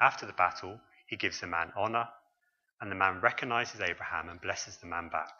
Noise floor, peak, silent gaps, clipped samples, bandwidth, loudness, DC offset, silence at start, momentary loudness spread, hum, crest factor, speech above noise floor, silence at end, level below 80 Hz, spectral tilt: -78 dBFS; -8 dBFS; 2.73-2.77 s; under 0.1%; 7.4 kHz; -33 LUFS; under 0.1%; 0 s; 14 LU; none; 26 dB; 45 dB; 0.05 s; -68 dBFS; -3 dB/octave